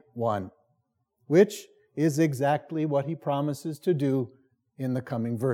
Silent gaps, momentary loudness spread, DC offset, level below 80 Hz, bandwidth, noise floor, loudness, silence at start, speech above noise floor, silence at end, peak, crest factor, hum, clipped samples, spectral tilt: none; 12 LU; under 0.1%; -82 dBFS; 17 kHz; -75 dBFS; -27 LUFS; 0.15 s; 49 dB; 0 s; -8 dBFS; 20 dB; none; under 0.1%; -7 dB/octave